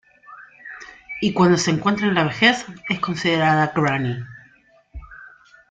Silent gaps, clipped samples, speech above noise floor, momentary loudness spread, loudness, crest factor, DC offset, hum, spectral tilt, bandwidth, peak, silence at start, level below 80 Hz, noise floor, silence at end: none; under 0.1%; 36 dB; 22 LU; -19 LUFS; 20 dB; under 0.1%; none; -5 dB/octave; 9.2 kHz; -2 dBFS; 0.3 s; -50 dBFS; -55 dBFS; 0.45 s